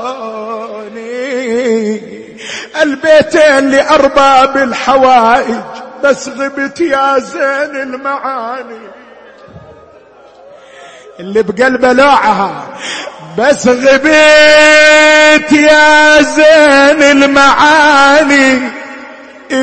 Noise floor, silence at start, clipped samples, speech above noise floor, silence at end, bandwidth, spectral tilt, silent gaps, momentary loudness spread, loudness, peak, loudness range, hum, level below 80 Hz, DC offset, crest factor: -38 dBFS; 0 s; 0.6%; 31 dB; 0 s; 11 kHz; -3 dB/octave; none; 18 LU; -7 LUFS; 0 dBFS; 14 LU; none; -42 dBFS; under 0.1%; 8 dB